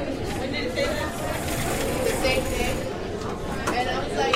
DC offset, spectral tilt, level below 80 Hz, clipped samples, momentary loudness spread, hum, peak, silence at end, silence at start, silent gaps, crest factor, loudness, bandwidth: under 0.1%; -4 dB/octave; -36 dBFS; under 0.1%; 7 LU; none; -4 dBFS; 0 s; 0 s; none; 22 dB; -26 LUFS; 16 kHz